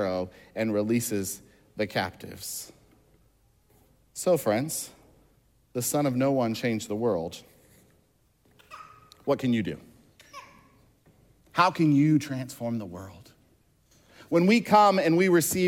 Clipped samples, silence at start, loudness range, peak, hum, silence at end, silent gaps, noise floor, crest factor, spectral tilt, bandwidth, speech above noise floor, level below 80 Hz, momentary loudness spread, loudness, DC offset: under 0.1%; 0 s; 9 LU; -8 dBFS; none; 0 s; none; -66 dBFS; 20 dB; -5 dB/octave; 17 kHz; 41 dB; -66 dBFS; 23 LU; -26 LUFS; under 0.1%